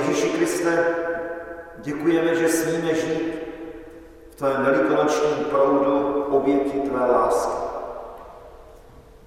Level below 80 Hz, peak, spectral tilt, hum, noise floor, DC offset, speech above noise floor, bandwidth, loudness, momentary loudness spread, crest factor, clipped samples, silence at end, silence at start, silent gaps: -52 dBFS; -8 dBFS; -5 dB/octave; none; -46 dBFS; under 0.1%; 26 dB; 16 kHz; -22 LUFS; 16 LU; 16 dB; under 0.1%; 0.25 s; 0 s; none